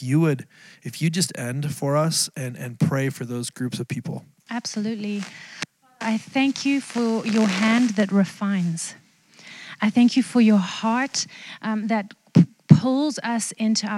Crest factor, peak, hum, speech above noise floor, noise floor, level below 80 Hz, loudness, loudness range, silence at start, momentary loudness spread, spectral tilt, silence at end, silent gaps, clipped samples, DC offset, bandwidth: 22 dB; 0 dBFS; none; 27 dB; -50 dBFS; -66 dBFS; -22 LUFS; 7 LU; 0 s; 15 LU; -5 dB/octave; 0 s; none; under 0.1%; under 0.1%; 15 kHz